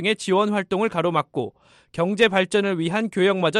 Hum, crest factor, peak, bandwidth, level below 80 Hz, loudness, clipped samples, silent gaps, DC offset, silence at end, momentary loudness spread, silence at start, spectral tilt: none; 16 dB; -6 dBFS; 12 kHz; -62 dBFS; -22 LUFS; under 0.1%; none; under 0.1%; 0 s; 10 LU; 0 s; -5 dB/octave